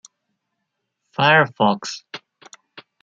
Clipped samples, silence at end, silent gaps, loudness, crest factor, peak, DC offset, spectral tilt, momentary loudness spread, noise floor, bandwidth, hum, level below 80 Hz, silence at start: under 0.1%; 0.2 s; none; -17 LUFS; 20 dB; -2 dBFS; under 0.1%; -4.5 dB/octave; 22 LU; -77 dBFS; 9 kHz; none; -66 dBFS; 1.2 s